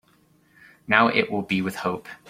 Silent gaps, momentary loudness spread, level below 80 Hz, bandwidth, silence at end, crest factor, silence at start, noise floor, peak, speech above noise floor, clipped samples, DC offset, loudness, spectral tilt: none; 10 LU; -62 dBFS; 16 kHz; 0 s; 24 dB; 0.9 s; -60 dBFS; -2 dBFS; 37 dB; under 0.1%; under 0.1%; -22 LUFS; -5.5 dB/octave